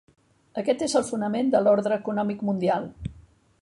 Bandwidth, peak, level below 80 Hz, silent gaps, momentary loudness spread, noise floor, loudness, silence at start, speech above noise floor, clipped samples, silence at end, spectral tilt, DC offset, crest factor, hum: 11.5 kHz; -8 dBFS; -54 dBFS; none; 16 LU; -52 dBFS; -24 LUFS; 0.55 s; 28 dB; under 0.1%; 0.45 s; -5.5 dB/octave; under 0.1%; 18 dB; none